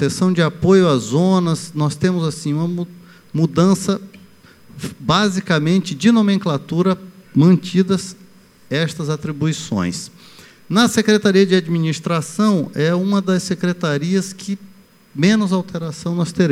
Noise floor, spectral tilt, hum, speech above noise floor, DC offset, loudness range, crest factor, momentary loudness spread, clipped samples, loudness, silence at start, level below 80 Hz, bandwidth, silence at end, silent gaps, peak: -45 dBFS; -6 dB/octave; none; 29 dB; under 0.1%; 4 LU; 16 dB; 12 LU; under 0.1%; -17 LUFS; 0 s; -52 dBFS; 14 kHz; 0 s; none; -2 dBFS